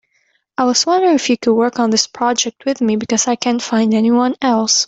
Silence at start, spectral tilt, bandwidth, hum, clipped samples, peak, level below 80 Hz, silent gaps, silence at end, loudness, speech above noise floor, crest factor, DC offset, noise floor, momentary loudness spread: 0.6 s; -3 dB/octave; 8 kHz; none; under 0.1%; 0 dBFS; -60 dBFS; none; 0 s; -15 LUFS; 47 dB; 16 dB; under 0.1%; -62 dBFS; 5 LU